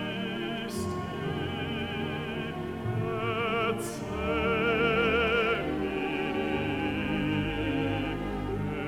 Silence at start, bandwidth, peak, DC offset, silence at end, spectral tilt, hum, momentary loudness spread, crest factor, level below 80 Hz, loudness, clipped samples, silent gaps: 0 s; 17.5 kHz; -14 dBFS; under 0.1%; 0 s; -6 dB/octave; none; 8 LU; 16 dB; -46 dBFS; -30 LUFS; under 0.1%; none